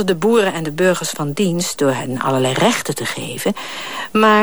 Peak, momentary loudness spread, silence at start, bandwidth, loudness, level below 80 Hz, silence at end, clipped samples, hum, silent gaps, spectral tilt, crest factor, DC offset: -2 dBFS; 7 LU; 0 s; over 20 kHz; -18 LUFS; -58 dBFS; 0 s; under 0.1%; none; none; -4.5 dB/octave; 14 dB; 1%